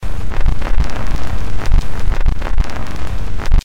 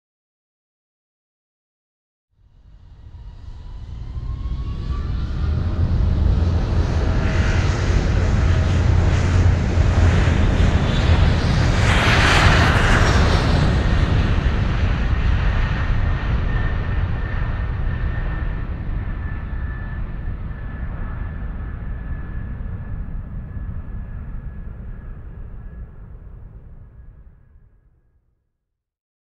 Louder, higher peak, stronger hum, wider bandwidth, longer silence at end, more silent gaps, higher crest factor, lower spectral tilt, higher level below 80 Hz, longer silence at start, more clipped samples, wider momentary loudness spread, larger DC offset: about the same, -22 LUFS vs -20 LUFS; about the same, -2 dBFS vs -2 dBFS; neither; second, 7.8 kHz vs 10 kHz; second, 0 s vs 2.05 s; neither; second, 12 dB vs 18 dB; about the same, -6 dB/octave vs -6 dB/octave; first, -14 dBFS vs -24 dBFS; second, 0 s vs 2.75 s; neither; second, 5 LU vs 20 LU; first, 20% vs under 0.1%